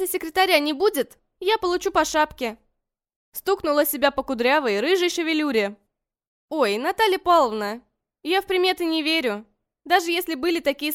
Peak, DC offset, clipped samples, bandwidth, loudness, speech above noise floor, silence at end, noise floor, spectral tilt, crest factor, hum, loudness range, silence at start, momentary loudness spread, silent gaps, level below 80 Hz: -4 dBFS; under 0.1%; under 0.1%; 17 kHz; -22 LUFS; 53 dB; 0 s; -75 dBFS; -2.5 dB/octave; 18 dB; none; 2 LU; 0 s; 12 LU; 3.16-3.32 s, 6.28-6.48 s; -56 dBFS